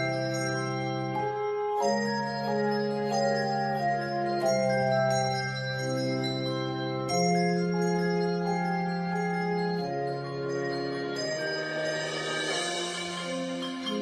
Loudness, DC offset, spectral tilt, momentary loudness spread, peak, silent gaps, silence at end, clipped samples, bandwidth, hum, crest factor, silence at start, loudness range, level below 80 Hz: -29 LUFS; under 0.1%; -5 dB/octave; 6 LU; -14 dBFS; none; 0 s; under 0.1%; 13 kHz; none; 14 dB; 0 s; 3 LU; -66 dBFS